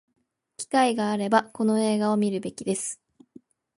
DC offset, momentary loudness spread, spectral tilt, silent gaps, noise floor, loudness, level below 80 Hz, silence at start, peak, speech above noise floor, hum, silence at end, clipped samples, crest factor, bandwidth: under 0.1%; 9 LU; -4.5 dB/octave; none; -54 dBFS; -25 LUFS; -72 dBFS; 0.6 s; -6 dBFS; 30 dB; none; 0.85 s; under 0.1%; 20 dB; 11.5 kHz